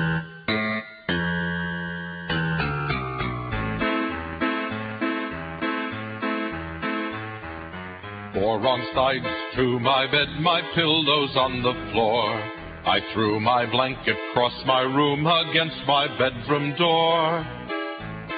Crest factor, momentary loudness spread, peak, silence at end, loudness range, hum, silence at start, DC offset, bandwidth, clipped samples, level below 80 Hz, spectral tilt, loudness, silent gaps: 20 dB; 11 LU; -6 dBFS; 0 s; 6 LU; none; 0 s; under 0.1%; 5 kHz; under 0.1%; -46 dBFS; -10 dB/octave; -24 LUFS; none